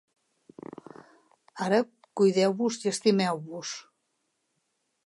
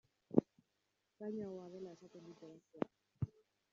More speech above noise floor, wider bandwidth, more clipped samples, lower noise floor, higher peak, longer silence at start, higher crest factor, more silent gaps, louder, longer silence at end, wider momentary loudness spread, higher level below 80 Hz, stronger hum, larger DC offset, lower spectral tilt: first, 52 dB vs 37 dB; first, 11.5 kHz vs 7.4 kHz; neither; second, -77 dBFS vs -85 dBFS; first, -10 dBFS vs -14 dBFS; first, 1.55 s vs 0.3 s; second, 18 dB vs 32 dB; neither; first, -27 LUFS vs -44 LUFS; first, 1.25 s vs 0.45 s; about the same, 21 LU vs 21 LU; second, -80 dBFS vs -74 dBFS; neither; neither; second, -5 dB/octave vs -9.5 dB/octave